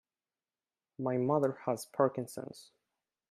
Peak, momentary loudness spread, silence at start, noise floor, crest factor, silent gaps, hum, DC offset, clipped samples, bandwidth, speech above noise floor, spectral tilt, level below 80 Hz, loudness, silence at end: -14 dBFS; 15 LU; 1 s; under -90 dBFS; 22 dB; none; none; under 0.1%; under 0.1%; 15.5 kHz; over 57 dB; -7 dB/octave; -80 dBFS; -33 LUFS; 0.7 s